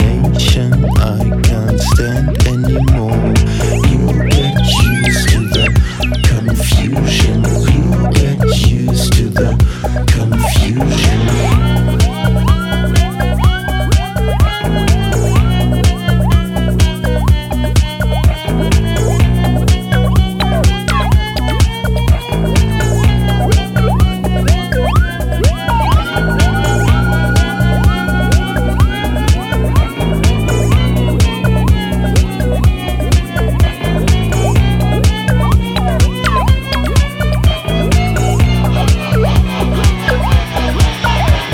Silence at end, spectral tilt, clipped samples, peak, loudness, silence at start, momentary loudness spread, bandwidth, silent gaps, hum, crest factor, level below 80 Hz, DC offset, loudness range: 0 s; -6 dB/octave; under 0.1%; 0 dBFS; -13 LUFS; 0 s; 2 LU; 16.5 kHz; none; none; 12 dB; -16 dBFS; under 0.1%; 1 LU